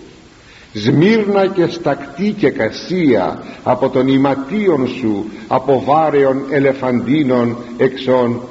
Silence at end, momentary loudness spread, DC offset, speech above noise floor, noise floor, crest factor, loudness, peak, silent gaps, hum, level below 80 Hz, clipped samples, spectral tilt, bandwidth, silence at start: 0 s; 7 LU; under 0.1%; 27 dB; -41 dBFS; 14 dB; -15 LUFS; 0 dBFS; none; none; -50 dBFS; under 0.1%; -5.5 dB/octave; 8 kHz; 0 s